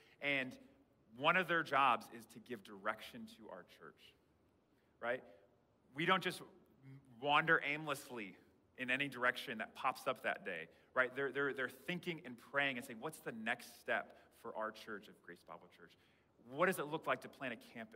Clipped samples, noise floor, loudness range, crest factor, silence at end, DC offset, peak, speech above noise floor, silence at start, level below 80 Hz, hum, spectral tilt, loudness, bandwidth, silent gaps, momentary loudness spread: under 0.1%; -75 dBFS; 8 LU; 24 dB; 0 s; under 0.1%; -18 dBFS; 34 dB; 0.2 s; -86 dBFS; none; -4 dB/octave; -39 LUFS; 16 kHz; none; 21 LU